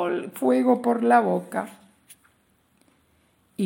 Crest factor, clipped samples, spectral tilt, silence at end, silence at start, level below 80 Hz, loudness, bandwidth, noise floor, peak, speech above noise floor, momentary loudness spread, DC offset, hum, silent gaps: 20 dB; under 0.1%; -6.5 dB/octave; 0 s; 0 s; -76 dBFS; -22 LUFS; 17 kHz; -65 dBFS; -6 dBFS; 43 dB; 15 LU; under 0.1%; none; none